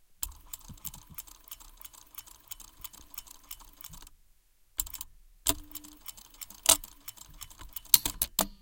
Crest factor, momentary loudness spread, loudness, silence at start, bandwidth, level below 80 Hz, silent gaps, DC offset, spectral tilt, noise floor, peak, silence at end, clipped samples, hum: 36 dB; 23 LU; -28 LUFS; 0.2 s; 17 kHz; -52 dBFS; none; under 0.1%; -0.5 dB/octave; -63 dBFS; 0 dBFS; 0.05 s; under 0.1%; none